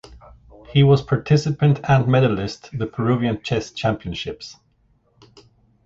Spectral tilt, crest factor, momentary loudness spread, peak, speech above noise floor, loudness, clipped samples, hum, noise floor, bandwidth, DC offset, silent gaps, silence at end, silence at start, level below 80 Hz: -7 dB/octave; 18 dB; 13 LU; -4 dBFS; 43 dB; -20 LUFS; under 0.1%; none; -61 dBFS; 7.6 kHz; under 0.1%; none; 1.35 s; 0.1 s; -46 dBFS